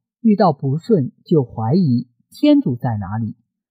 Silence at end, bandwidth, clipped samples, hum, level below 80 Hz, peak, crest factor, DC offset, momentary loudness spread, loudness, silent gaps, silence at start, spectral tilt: 0.4 s; 10 kHz; under 0.1%; none; -56 dBFS; -4 dBFS; 14 dB; under 0.1%; 10 LU; -18 LUFS; none; 0.25 s; -9.5 dB/octave